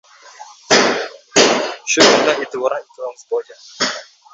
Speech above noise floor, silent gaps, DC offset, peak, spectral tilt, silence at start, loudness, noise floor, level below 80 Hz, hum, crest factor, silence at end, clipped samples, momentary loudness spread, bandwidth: 23 dB; none; under 0.1%; 0 dBFS; -1.5 dB/octave; 0.4 s; -15 LUFS; -40 dBFS; -62 dBFS; none; 18 dB; 0.3 s; under 0.1%; 14 LU; 8.2 kHz